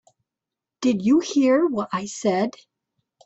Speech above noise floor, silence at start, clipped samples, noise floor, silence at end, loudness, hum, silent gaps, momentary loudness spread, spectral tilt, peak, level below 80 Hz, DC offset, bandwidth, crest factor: 67 dB; 0.8 s; under 0.1%; -87 dBFS; 0.75 s; -22 LUFS; none; none; 8 LU; -5.5 dB/octave; -8 dBFS; -66 dBFS; under 0.1%; 8.2 kHz; 14 dB